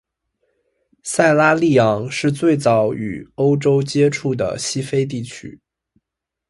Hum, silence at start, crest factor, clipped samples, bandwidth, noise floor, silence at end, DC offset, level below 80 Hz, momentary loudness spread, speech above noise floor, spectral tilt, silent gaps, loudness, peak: none; 1.05 s; 18 dB; under 0.1%; 11.5 kHz; -82 dBFS; 1 s; under 0.1%; -54 dBFS; 14 LU; 65 dB; -5.5 dB/octave; none; -17 LUFS; 0 dBFS